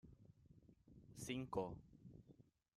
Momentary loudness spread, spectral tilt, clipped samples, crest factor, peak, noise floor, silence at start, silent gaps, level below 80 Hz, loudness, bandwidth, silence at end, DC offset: 23 LU; -5.5 dB/octave; under 0.1%; 24 dB; -30 dBFS; -70 dBFS; 0.05 s; none; -72 dBFS; -49 LUFS; 13.5 kHz; 0.35 s; under 0.1%